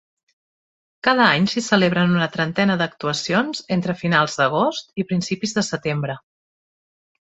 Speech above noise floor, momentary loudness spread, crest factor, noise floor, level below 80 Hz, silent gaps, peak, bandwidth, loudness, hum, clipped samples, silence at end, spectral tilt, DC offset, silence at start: over 70 dB; 8 LU; 20 dB; under -90 dBFS; -60 dBFS; none; 0 dBFS; 8.2 kHz; -20 LUFS; none; under 0.1%; 1.1 s; -5 dB/octave; under 0.1%; 1.05 s